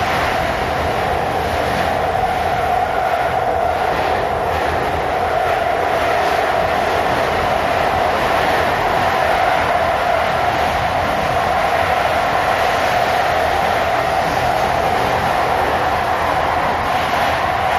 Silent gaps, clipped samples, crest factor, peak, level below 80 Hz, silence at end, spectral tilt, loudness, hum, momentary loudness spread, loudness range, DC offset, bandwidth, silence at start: none; under 0.1%; 14 dB; -2 dBFS; -34 dBFS; 0 s; -4.5 dB/octave; -17 LUFS; none; 2 LU; 2 LU; under 0.1%; 15.5 kHz; 0 s